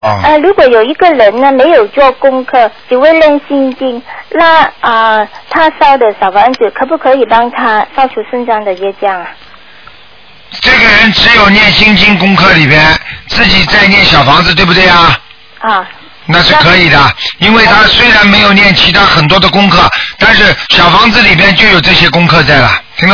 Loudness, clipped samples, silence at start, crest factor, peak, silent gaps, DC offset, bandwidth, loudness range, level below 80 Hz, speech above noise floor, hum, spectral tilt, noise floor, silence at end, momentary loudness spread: -5 LUFS; 7%; 0 s; 6 dB; 0 dBFS; none; under 0.1%; 5.4 kHz; 6 LU; -28 dBFS; 31 dB; none; -5 dB/octave; -37 dBFS; 0 s; 10 LU